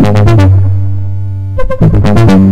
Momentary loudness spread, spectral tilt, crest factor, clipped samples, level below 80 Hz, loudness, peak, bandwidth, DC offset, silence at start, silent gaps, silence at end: 11 LU; -8.5 dB/octave; 6 dB; 4%; -20 dBFS; -9 LUFS; 0 dBFS; 8.4 kHz; under 0.1%; 0 s; none; 0 s